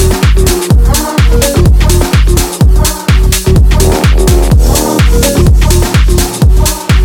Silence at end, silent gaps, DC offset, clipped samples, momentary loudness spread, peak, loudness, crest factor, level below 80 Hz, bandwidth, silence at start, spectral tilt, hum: 0 s; none; under 0.1%; 0.3%; 2 LU; 0 dBFS; -8 LUFS; 6 dB; -8 dBFS; 18 kHz; 0 s; -5 dB/octave; none